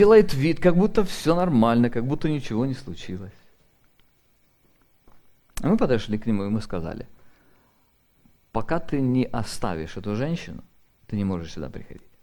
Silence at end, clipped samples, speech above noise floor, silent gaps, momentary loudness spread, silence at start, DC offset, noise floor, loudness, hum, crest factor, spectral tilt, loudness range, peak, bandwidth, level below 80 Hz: 0.3 s; under 0.1%; 41 dB; none; 17 LU; 0 s; under 0.1%; -63 dBFS; -24 LUFS; none; 20 dB; -7 dB/octave; 8 LU; -4 dBFS; 19 kHz; -42 dBFS